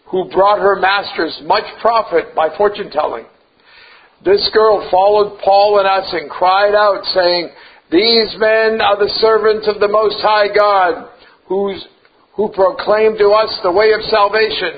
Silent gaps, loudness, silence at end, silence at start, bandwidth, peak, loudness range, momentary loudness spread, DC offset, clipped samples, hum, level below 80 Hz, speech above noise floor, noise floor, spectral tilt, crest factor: none; -13 LUFS; 0 s; 0.1 s; 5 kHz; 0 dBFS; 4 LU; 9 LU; under 0.1%; under 0.1%; none; -48 dBFS; 33 dB; -46 dBFS; -7.5 dB/octave; 14 dB